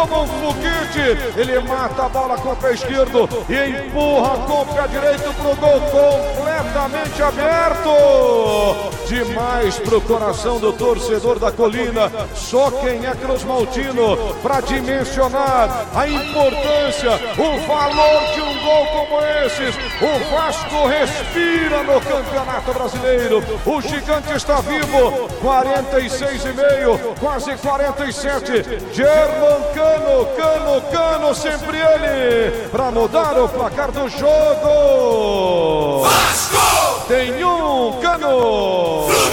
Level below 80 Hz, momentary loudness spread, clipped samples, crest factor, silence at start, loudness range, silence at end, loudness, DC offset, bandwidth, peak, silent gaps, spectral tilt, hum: -32 dBFS; 7 LU; under 0.1%; 16 dB; 0 s; 3 LU; 0 s; -16 LUFS; 0.2%; 17.5 kHz; 0 dBFS; none; -4 dB/octave; none